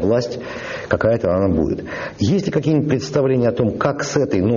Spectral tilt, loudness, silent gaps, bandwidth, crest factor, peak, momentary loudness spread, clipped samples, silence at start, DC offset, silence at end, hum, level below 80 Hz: -6.5 dB/octave; -19 LUFS; none; 7.4 kHz; 16 dB; -2 dBFS; 9 LU; under 0.1%; 0 s; under 0.1%; 0 s; none; -42 dBFS